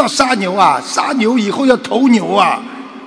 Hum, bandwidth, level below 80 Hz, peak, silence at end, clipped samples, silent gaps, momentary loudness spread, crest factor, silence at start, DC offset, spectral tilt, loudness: none; 11 kHz; -54 dBFS; 0 dBFS; 0 s; 0.4%; none; 4 LU; 12 dB; 0 s; under 0.1%; -4 dB/octave; -13 LUFS